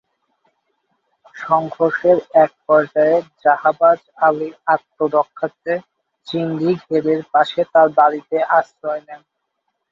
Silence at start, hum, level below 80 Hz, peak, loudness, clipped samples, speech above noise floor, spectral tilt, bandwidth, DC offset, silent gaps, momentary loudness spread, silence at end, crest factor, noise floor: 1.35 s; none; -66 dBFS; -2 dBFS; -17 LUFS; under 0.1%; 57 dB; -7.5 dB/octave; 7.2 kHz; under 0.1%; none; 11 LU; 0.75 s; 16 dB; -73 dBFS